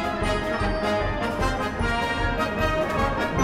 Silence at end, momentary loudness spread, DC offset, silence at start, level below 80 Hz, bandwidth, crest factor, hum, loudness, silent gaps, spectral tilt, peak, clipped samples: 0 s; 2 LU; under 0.1%; 0 s; -32 dBFS; 15.5 kHz; 14 dB; none; -25 LUFS; none; -5.5 dB/octave; -10 dBFS; under 0.1%